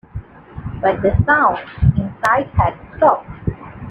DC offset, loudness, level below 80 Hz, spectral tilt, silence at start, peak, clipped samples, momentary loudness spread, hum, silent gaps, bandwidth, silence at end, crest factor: under 0.1%; -17 LUFS; -30 dBFS; -8 dB/octave; 0.15 s; 0 dBFS; under 0.1%; 19 LU; none; none; 11.5 kHz; 0 s; 18 dB